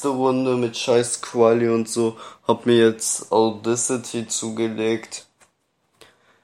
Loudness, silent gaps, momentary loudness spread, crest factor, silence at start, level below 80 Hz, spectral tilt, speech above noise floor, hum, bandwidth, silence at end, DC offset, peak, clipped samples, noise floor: -21 LUFS; none; 9 LU; 18 dB; 0 s; -68 dBFS; -4 dB/octave; 47 dB; none; 14.5 kHz; 1.2 s; under 0.1%; -4 dBFS; under 0.1%; -68 dBFS